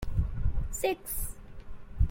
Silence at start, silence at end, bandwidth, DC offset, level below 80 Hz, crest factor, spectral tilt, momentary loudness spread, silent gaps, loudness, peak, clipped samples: 0 s; 0 s; 16.5 kHz; under 0.1%; -34 dBFS; 16 dB; -5.5 dB/octave; 19 LU; none; -34 LUFS; -14 dBFS; under 0.1%